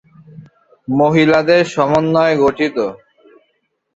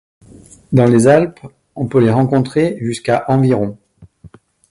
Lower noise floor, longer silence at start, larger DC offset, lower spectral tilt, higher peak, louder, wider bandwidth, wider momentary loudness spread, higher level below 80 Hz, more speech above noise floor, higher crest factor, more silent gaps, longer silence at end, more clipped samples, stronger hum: first, -66 dBFS vs -43 dBFS; second, 0.35 s vs 0.7 s; neither; about the same, -6.5 dB/octave vs -7.5 dB/octave; about the same, 0 dBFS vs 0 dBFS; about the same, -14 LUFS vs -14 LUFS; second, 8 kHz vs 11.5 kHz; about the same, 10 LU vs 12 LU; about the same, -52 dBFS vs -48 dBFS; first, 53 dB vs 30 dB; about the same, 16 dB vs 16 dB; neither; first, 1 s vs 0.45 s; neither; neither